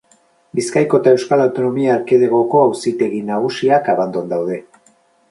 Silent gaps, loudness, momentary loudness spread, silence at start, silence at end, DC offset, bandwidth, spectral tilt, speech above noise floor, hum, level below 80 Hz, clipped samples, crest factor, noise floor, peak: none; -16 LUFS; 8 LU; 0.55 s; 0.7 s; under 0.1%; 11.5 kHz; -6 dB/octave; 40 dB; none; -64 dBFS; under 0.1%; 16 dB; -55 dBFS; 0 dBFS